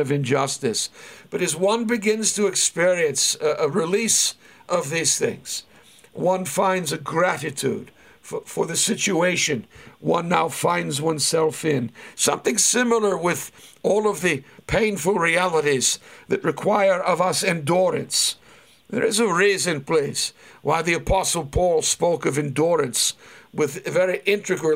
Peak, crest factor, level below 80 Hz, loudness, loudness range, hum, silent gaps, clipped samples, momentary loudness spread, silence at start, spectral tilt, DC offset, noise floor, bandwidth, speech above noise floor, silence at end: -4 dBFS; 18 dB; -48 dBFS; -21 LUFS; 3 LU; none; none; under 0.1%; 9 LU; 0 s; -3 dB/octave; under 0.1%; -51 dBFS; 16 kHz; 29 dB; 0 s